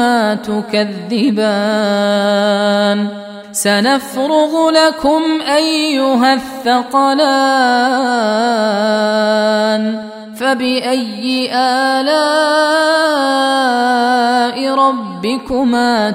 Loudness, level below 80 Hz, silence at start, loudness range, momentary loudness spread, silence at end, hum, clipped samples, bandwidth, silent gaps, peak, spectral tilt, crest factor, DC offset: -13 LUFS; -52 dBFS; 0 s; 2 LU; 6 LU; 0 s; none; under 0.1%; 16 kHz; none; 0 dBFS; -4 dB/octave; 14 dB; under 0.1%